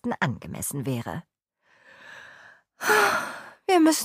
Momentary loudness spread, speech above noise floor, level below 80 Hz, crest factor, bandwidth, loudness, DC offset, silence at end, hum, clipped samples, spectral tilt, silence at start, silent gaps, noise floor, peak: 24 LU; 41 dB; -62 dBFS; 20 dB; 15.5 kHz; -25 LUFS; under 0.1%; 0 s; none; under 0.1%; -4 dB/octave; 0.05 s; none; -65 dBFS; -8 dBFS